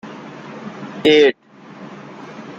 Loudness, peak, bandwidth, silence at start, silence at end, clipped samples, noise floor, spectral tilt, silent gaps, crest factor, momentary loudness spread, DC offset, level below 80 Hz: -14 LUFS; -2 dBFS; 7.8 kHz; 0.05 s; 0.05 s; under 0.1%; -38 dBFS; -5 dB/octave; none; 18 dB; 25 LU; under 0.1%; -64 dBFS